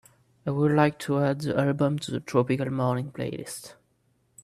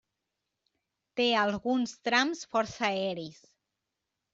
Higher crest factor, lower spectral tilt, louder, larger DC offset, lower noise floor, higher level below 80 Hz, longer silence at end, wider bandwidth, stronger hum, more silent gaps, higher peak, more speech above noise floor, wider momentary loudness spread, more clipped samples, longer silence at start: about the same, 20 dB vs 22 dB; first, -7 dB/octave vs -3.5 dB/octave; first, -26 LUFS vs -29 LUFS; neither; second, -69 dBFS vs -86 dBFS; first, -64 dBFS vs -70 dBFS; second, 0.7 s vs 1 s; first, 14.5 kHz vs 7.8 kHz; neither; neither; first, -6 dBFS vs -10 dBFS; second, 43 dB vs 56 dB; about the same, 13 LU vs 12 LU; neither; second, 0.45 s vs 1.15 s